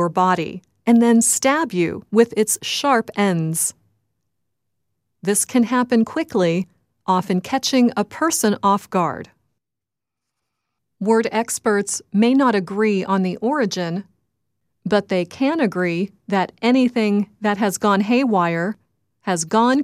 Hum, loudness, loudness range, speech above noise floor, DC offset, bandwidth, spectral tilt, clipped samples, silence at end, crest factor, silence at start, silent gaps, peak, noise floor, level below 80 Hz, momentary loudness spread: none; -19 LUFS; 5 LU; 68 dB; under 0.1%; 15.5 kHz; -4.5 dB/octave; under 0.1%; 0 s; 18 dB; 0 s; none; -2 dBFS; -86 dBFS; -64 dBFS; 8 LU